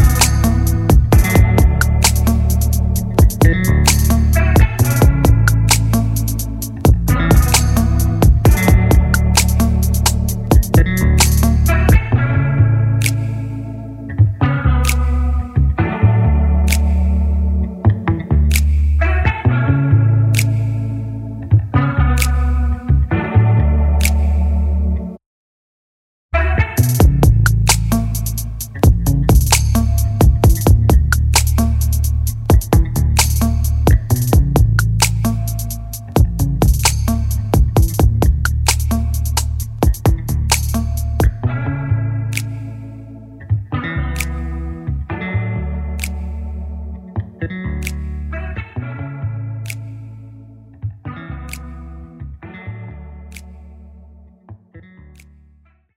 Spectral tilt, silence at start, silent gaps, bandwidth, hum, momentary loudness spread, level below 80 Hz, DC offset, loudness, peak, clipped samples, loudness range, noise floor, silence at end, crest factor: -5 dB/octave; 0 s; 25.26-26.29 s; 16.5 kHz; none; 15 LU; -18 dBFS; under 0.1%; -15 LUFS; 0 dBFS; under 0.1%; 12 LU; -51 dBFS; 1.2 s; 14 dB